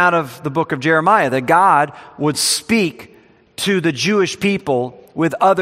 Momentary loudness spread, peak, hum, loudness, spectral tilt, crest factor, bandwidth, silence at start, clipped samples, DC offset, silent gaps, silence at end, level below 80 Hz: 9 LU; 0 dBFS; none; -16 LUFS; -4 dB/octave; 16 dB; 16 kHz; 0 s; under 0.1%; under 0.1%; none; 0 s; -58 dBFS